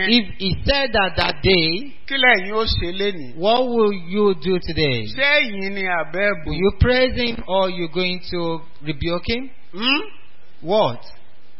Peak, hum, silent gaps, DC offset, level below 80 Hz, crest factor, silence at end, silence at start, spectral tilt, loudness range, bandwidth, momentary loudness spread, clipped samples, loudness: 0 dBFS; none; none; 4%; -34 dBFS; 20 dB; 0.5 s; 0 s; -8 dB/octave; 5 LU; 6 kHz; 9 LU; under 0.1%; -19 LUFS